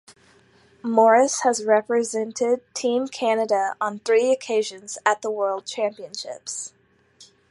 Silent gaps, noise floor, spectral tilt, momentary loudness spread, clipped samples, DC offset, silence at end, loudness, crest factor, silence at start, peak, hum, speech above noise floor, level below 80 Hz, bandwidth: none; -56 dBFS; -2.5 dB/octave; 14 LU; under 0.1%; under 0.1%; 0.25 s; -22 LUFS; 20 dB; 0.1 s; -4 dBFS; none; 34 dB; -74 dBFS; 11.5 kHz